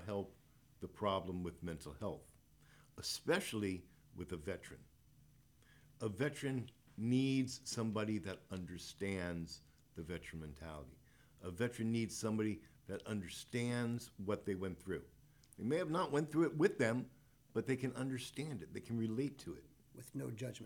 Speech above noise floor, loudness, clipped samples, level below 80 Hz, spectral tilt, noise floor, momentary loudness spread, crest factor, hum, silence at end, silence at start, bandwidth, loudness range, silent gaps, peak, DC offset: 27 dB; -42 LUFS; under 0.1%; -70 dBFS; -5.5 dB/octave; -68 dBFS; 16 LU; 22 dB; none; 0 s; 0 s; 19 kHz; 6 LU; none; -20 dBFS; under 0.1%